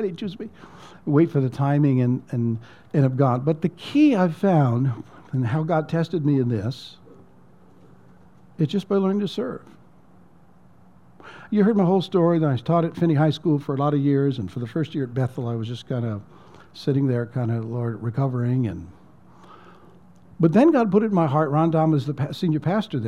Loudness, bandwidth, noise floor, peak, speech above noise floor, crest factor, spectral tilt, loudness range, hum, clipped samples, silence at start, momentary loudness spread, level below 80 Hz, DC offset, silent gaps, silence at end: -22 LUFS; 9.4 kHz; -54 dBFS; -4 dBFS; 32 dB; 18 dB; -9 dB/octave; 7 LU; none; under 0.1%; 0 s; 11 LU; -62 dBFS; 0.2%; none; 0 s